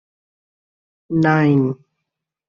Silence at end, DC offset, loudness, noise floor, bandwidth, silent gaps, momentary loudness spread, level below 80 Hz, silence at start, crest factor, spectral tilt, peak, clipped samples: 0.75 s; under 0.1%; -17 LUFS; -80 dBFS; 6.8 kHz; none; 10 LU; -60 dBFS; 1.1 s; 18 dB; -7.5 dB/octave; -4 dBFS; under 0.1%